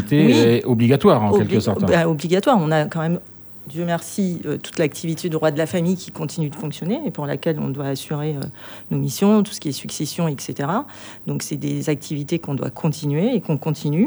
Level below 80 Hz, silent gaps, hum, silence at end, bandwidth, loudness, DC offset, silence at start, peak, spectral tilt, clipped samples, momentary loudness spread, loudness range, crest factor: -58 dBFS; none; none; 0 s; over 20 kHz; -20 LUFS; under 0.1%; 0 s; -2 dBFS; -6.5 dB/octave; under 0.1%; 12 LU; 7 LU; 18 dB